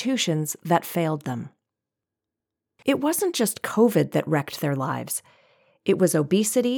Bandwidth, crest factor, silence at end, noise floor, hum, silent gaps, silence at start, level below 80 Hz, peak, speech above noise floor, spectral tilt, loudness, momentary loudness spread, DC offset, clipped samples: over 20 kHz; 18 dB; 0 s; -87 dBFS; none; none; 0 s; -74 dBFS; -6 dBFS; 64 dB; -5 dB/octave; -24 LUFS; 10 LU; under 0.1%; under 0.1%